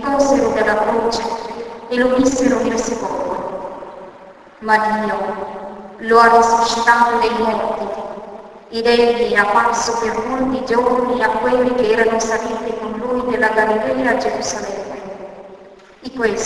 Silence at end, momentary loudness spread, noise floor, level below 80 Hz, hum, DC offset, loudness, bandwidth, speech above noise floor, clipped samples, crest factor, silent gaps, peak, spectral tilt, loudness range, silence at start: 0 s; 17 LU; -41 dBFS; -46 dBFS; none; under 0.1%; -16 LUFS; 11 kHz; 25 dB; under 0.1%; 18 dB; none; 0 dBFS; -3.5 dB/octave; 5 LU; 0 s